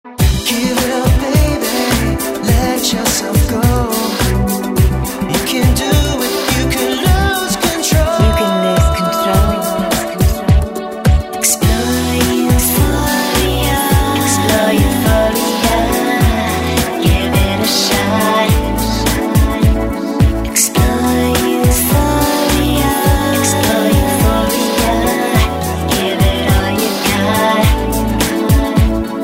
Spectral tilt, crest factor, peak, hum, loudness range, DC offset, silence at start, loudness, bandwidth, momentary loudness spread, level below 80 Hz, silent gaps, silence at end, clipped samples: -4.5 dB/octave; 12 dB; 0 dBFS; none; 2 LU; under 0.1%; 0.05 s; -13 LUFS; 16.5 kHz; 3 LU; -20 dBFS; none; 0 s; under 0.1%